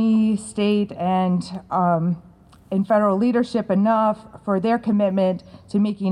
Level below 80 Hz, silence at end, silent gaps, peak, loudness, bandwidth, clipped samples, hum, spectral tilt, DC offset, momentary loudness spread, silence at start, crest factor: -58 dBFS; 0 s; none; -6 dBFS; -21 LUFS; 10.5 kHz; under 0.1%; none; -7.5 dB/octave; under 0.1%; 7 LU; 0 s; 14 dB